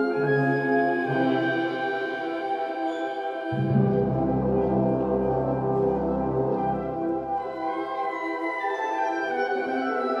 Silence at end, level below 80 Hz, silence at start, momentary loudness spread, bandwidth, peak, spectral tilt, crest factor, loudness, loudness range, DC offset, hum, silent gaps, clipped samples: 0 s; -48 dBFS; 0 s; 6 LU; 7.4 kHz; -10 dBFS; -8.5 dB/octave; 14 dB; -26 LUFS; 3 LU; under 0.1%; none; none; under 0.1%